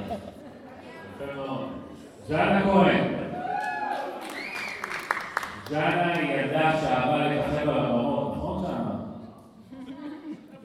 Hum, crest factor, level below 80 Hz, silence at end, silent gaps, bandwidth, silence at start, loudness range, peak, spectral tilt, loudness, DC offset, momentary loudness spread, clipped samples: none; 20 dB; -54 dBFS; 0 s; none; 15 kHz; 0 s; 4 LU; -6 dBFS; -6.5 dB/octave; -27 LUFS; under 0.1%; 21 LU; under 0.1%